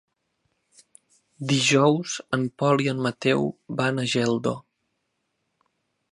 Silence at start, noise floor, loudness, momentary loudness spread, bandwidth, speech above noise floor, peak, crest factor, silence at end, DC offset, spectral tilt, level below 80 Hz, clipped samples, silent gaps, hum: 1.4 s; -76 dBFS; -23 LUFS; 9 LU; 11.5 kHz; 53 dB; -6 dBFS; 18 dB; 1.5 s; under 0.1%; -4.5 dB/octave; -66 dBFS; under 0.1%; none; none